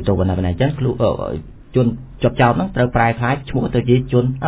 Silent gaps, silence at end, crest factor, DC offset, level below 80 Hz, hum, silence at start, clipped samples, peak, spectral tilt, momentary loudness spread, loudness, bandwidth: none; 0 s; 16 dB; under 0.1%; -34 dBFS; none; 0 s; under 0.1%; 0 dBFS; -11.5 dB/octave; 5 LU; -18 LUFS; 4 kHz